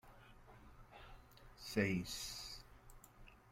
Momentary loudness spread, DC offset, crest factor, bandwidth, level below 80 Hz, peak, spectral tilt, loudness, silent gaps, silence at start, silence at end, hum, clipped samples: 24 LU; under 0.1%; 24 dB; 16.5 kHz; -62 dBFS; -22 dBFS; -4.5 dB/octave; -43 LUFS; none; 0.05 s; 0 s; none; under 0.1%